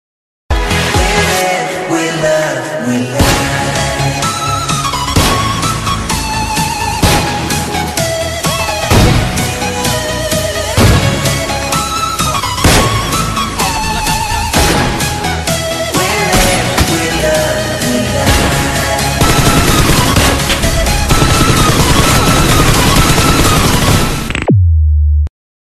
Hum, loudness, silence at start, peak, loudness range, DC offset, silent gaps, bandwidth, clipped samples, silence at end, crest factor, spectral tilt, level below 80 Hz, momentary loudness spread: none; -11 LUFS; 0.5 s; 0 dBFS; 4 LU; under 0.1%; none; 14 kHz; under 0.1%; 0.5 s; 12 dB; -4 dB/octave; -20 dBFS; 6 LU